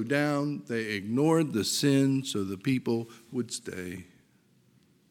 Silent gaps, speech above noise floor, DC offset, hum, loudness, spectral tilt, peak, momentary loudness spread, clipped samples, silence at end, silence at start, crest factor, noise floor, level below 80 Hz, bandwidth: none; 36 dB; under 0.1%; none; -29 LUFS; -5 dB/octave; -10 dBFS; 13 LU; under 0.1%; 1.1 s; 0 s; 18 dB; -65 dBFS; -72 dBFS; 18.5 kHz